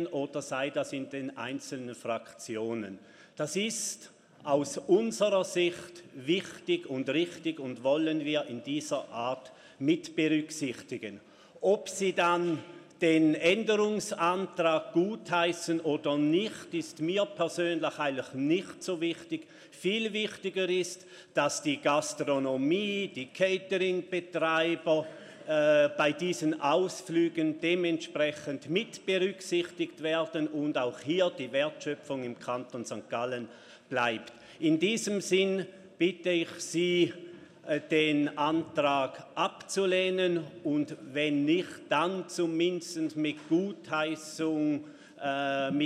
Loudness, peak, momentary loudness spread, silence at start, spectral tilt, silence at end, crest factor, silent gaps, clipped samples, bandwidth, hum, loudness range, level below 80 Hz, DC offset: -30 LUFS; -12 dBFS; 10 LU; 0 s; -4.5 dB/octave; 0 s; 20 dB; none; under 0.1%; 14 kHz; none; 4 LU; -80 dBFS; under 0.1%